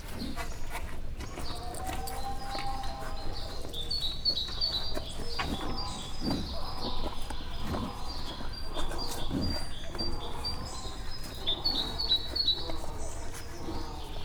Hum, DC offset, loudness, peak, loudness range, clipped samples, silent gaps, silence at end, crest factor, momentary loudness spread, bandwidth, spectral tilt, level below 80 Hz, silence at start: none; under 0.1%; -34 LUFS; -16 dBFS; 6 LU; under 0.1%; none; 0 s; 16 dB; 12 LU; 17.5 kHz; -4 dB/octave; -38 dBFS; 0 s